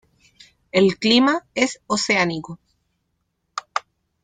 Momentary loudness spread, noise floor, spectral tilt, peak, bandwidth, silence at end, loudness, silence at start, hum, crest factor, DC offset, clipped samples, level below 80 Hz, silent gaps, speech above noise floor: 17 LU; -73 dBFS; -4 dB/octave; -4 dBFS; 9.6 kHz; 0.45 s; -20 LUFS; 0.75 s; none; 18 dB; under 0.1%; under 0.1%; -60 dBFS; none; 54 dB